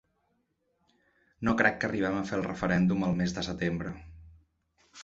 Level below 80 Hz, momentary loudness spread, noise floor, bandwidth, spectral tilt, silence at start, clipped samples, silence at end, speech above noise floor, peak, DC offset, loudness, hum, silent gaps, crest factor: -54 dBFS; 9 LU; -76 dBFS; 7.8 kHz; -6.5 dB/octave; 1.4 s; under 0.1%; 0 s; 47 dB; -8 dBFS; under 0.1%; -29 LUFS; none; none; 22 dB